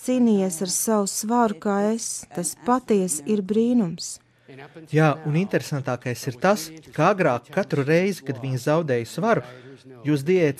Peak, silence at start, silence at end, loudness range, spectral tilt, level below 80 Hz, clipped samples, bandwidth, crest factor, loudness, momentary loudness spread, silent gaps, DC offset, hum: -6 dBFS; 0 s; 0.05 s; 2 LU; -5.5 dB/octave; -66 dBFS; under 0.1%; 15.5 kHz; 16 dB; -23 LUFS; 9 LU; none; under 0.1%; none